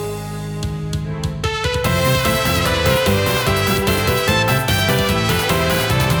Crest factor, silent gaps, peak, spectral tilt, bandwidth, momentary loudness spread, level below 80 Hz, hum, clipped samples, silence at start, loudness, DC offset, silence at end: 14 dB; none; -4 dBFS; -4.5 dB/octave; over 20 kHz; 9 LU; -30 dBFS; none; under 0.1%; 0 s; -17 LUFS; under 0.1%; 0 s